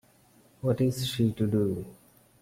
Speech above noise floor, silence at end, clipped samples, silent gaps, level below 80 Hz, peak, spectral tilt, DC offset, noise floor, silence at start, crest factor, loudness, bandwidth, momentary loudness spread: 33 dB; 0.5 s; under 0.1%; none; -58 dBFS; -14 dBFS; -7 dB/octave; under 0.1%; -61 dBFS; 0.65 s; 16 dB; -28 LUFS; 16.5 kHz; 9 LU